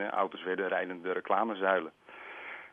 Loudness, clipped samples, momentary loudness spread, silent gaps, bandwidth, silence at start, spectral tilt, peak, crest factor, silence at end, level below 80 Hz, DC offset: -32 LUFS; under 0.1%; 16 LU; none; 4.1 kHz; 0 s; -7 dB/octave; -14 dBFS; 20 dB; 0 s; -84 dBFS; under 0.1%